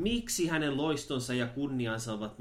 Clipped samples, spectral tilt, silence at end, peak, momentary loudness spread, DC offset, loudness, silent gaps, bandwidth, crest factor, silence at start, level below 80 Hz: under 0.1%; -4.5 dB/octave; 0 s; -18 dBFS; 4 LU; under 0.1%; -32 LUFS; none; 16 kHz; 14 dB; 0 s; -52 dBFS